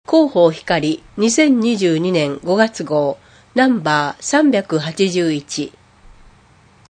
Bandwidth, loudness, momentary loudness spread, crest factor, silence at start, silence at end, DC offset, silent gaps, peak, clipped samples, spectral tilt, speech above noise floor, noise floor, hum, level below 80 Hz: 9.8 kHz; -16 LUFS; 9 LU; 16 dB; 0.1 s; 1.2 s; under 0.1%; none; 0 dBFS; under 0.1%; -4.5 dB/octave; 34 dB; -49 dBFS; none; -54 dBFS